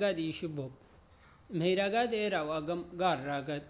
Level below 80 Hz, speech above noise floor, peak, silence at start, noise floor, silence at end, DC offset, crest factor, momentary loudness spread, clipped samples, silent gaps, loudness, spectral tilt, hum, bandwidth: -64 dBFS; 27 dB; -18 dBFS; 0 s; -60 dBFS; 0 s; under 0.1%; 16 dB; 10 LU; under 0.1%; none; -33 LUFS; -4 dB/octave; none; 4 kHz